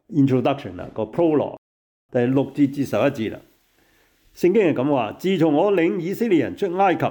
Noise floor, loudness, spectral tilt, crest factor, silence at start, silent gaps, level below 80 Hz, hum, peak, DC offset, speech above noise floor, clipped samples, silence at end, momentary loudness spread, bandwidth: -60 dBFS; -21 LUFS; -7.5 dB/octave; 12 dB; 0.1 s; 1.58-2.09 s; -62 dBFS; none; -8 dBFS; under 0.1%; 40 dB; under 0.1%; 0 s; 11 LU; 19.5 kHz